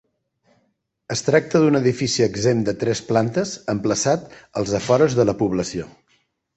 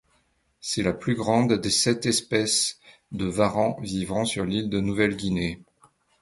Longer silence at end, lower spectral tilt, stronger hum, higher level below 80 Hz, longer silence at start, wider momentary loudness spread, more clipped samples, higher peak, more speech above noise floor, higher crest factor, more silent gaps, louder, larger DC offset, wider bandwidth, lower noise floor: about the same, 0.7 s vs 0.65 s; about the same, -5 dB/octave vs -4 dB/octave; neither; about the same, -52 dBFS vs -50 dBFS; first, 1.1 s vs 0.65 s; about the same, 10 LU vs 9 LU; neither; about the same, -4 dBFS vs -6 dBFS; first, 49 dB vs 43 dB; about the same, 18 dB vs 20 dB; neither; first, -20 LUFS vs -24 LUFS; neither; second, 8.4 kHz vs 12 kHz; about the same, -69 dBFS vs -68 dBFS